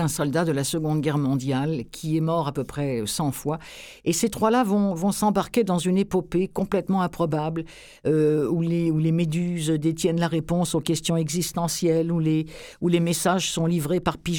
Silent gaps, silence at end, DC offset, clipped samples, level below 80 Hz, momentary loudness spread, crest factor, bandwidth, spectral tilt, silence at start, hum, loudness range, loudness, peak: none; 0 s; under 0.1%; under 0.1%; -50 dBFS; 7 LU; 16 dB; 19 kHz; -5.5 dB/octave; 0 s; none; 2 LU; -24 LUFS; -6 dBFS